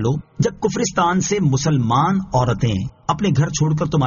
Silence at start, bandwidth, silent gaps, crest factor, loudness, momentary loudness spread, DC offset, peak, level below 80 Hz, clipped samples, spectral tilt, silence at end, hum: 0 s; 7.4 kHz; none; 14 dB; -19 LUFS; 5 LU; under 0.1%; -4 dBFS; -42 dBFS; under 0.1%; -6.5 dB/octave; 0 s; none